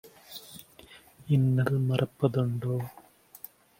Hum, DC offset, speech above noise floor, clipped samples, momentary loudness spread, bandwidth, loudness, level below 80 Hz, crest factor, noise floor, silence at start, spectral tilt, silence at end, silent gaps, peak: none; under 0.1%; 28 dB; under 0.1%; 21 LU; 16.5 kHz; -28 LUFS; -64 dBFS; 18 dB; -54 dBFS; 0.05 s; -8 dB/octave; 0.9 s; none; -10 dBFS